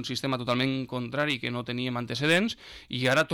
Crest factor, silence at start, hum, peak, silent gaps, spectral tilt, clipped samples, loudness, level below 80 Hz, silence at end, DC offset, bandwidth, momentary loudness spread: 14 dB; 0 s; none; -14 dBFS; none; -5 dB/octave; under 0.1%; -28 LUFS; -62 dBFS; 0 s; under 0.1%; 18.5 kHz; 8 LU